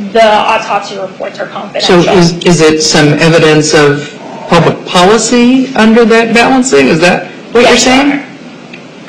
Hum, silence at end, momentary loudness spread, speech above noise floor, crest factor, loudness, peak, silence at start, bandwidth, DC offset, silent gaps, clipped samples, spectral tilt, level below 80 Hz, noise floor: none; 0 s; 13 LU; 22 dB; 8 dB; -6 LUFS; 0 dBFS; 0 s; 13 kHz; under 0.1%; none; 0.5%; -4.5 dB/octave; -36 dBFS; -28 dBFS